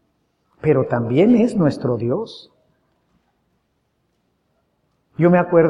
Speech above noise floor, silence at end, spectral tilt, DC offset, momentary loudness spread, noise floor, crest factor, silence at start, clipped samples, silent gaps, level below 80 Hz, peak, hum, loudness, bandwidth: 52 dB; 0 s; -9 dB/octave; under 0.1%; 15 LU; -68 dBFS; 18 dB; 0.65 s; under 0.1%; none; -56 dBFS; -2 dBFS; none; -18 LUFS; 10.5 kHz